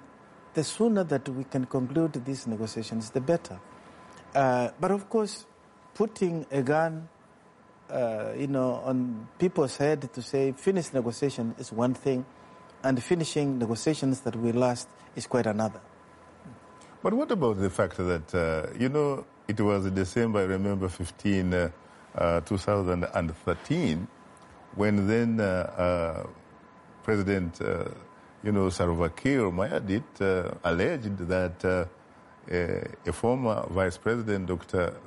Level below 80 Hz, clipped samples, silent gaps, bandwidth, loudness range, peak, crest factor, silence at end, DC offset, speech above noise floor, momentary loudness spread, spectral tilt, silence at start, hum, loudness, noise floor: -54 dBFS; under 0.1%; none; 11.5 kHz; 2 LU; -14 dBFS; 16 dB; 0 s; under 0.1%; 29 dB; 8 LU; -6.5 dB/octave; 0 s; none; -29 LUFS; -57 dBFS